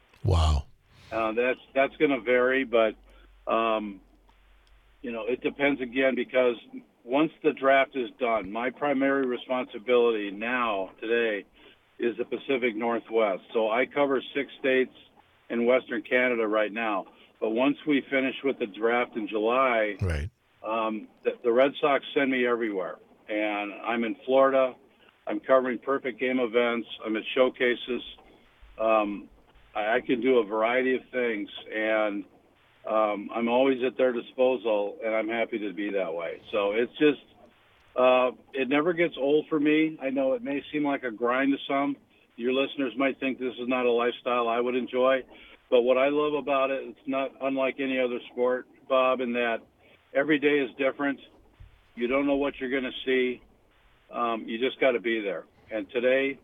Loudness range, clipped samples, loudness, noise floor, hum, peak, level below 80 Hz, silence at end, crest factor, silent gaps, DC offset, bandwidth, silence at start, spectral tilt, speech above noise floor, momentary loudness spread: 3 LU; under 0.1%; -27 LUFS; -61 dBFS; none; -6 dBFS; -50 dBFS; 0.1 s; 20 dB; none; under 0.1%; 10 kHz; 0.25 s; -7 dB/octave; 35 dB; 9 LU